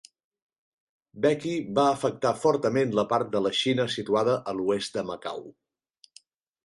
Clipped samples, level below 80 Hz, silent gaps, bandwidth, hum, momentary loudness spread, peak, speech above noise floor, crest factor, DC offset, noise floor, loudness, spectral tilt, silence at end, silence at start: under 0.1%; -66 dBFS; none; 11.5 kHz; none; 8 LU; -10 dBFS; 36 dB; 18 dB; under 0.1%; -62 dBFS; -26 LUFS; -5 dB/octave; 1.15 s; 1.15 s